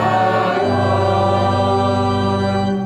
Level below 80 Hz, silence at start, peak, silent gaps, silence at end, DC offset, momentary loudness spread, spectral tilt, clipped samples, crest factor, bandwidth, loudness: -48 dBFS; 0 s; -4 dBFS; none; 0 s; under 0.1%; 2 LU; -7 dB/octave; under 0.1%; 12 dB; 9.4 kHz; -16 LUFS